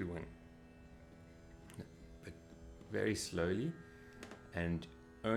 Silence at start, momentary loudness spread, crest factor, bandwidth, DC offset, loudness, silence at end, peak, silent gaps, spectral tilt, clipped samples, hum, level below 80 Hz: 0 s; 21 LU; 22 dB; 15.5 kHz; under 0.1%; -42 LUFS; 0 s; -22 dBFS; none; -5.5 dB/octave; under 0.1%; none; -60 dBFS